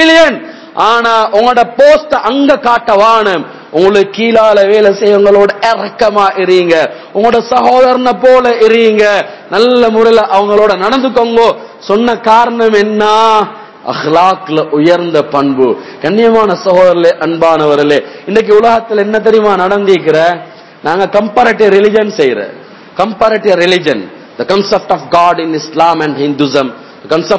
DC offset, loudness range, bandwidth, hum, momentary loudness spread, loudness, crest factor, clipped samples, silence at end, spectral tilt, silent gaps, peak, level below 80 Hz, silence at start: 0.4%; 3 LU; 8 kHz; none; 8 LU; -8 LUFS; 8 dB; 5%; 0 s; -5 dB/octave; none; 0 dBFS; -48 dBFS; 0 s